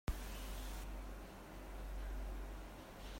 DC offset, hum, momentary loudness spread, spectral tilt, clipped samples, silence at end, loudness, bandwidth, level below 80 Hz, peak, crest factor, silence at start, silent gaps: under 0.1%; none; 6 LU; -5 dB/octave; under 0.1%; 0 s; -50 LUFS; 16 kHz; -48 dBFS; -28 dBFS; 18 dB; 0.05 s; none